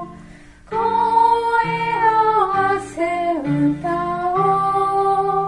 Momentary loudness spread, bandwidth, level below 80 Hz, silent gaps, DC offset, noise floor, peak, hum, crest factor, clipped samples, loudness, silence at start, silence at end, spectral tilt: 7 LU; 11 kHz; -48 dBFS; none; under 0.1%; -42 dBFS; -6 dBFS; none; 14 dB; under 0.1%; -18 LUFS; 0 s; 0 s; -6.5 dB/octave